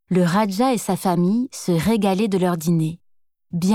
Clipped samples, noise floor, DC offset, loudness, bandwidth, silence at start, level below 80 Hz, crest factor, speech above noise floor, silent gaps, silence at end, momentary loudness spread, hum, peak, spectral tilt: under 0.1%; -61 dBFS; under 0.1%; -20 LUFS; 16 kHz; 0.1 s; -54 dBFS; 14 dB; 42 dB; none; 0 s; 5 LU; none; -6 dBFS; -6.5 dB/octave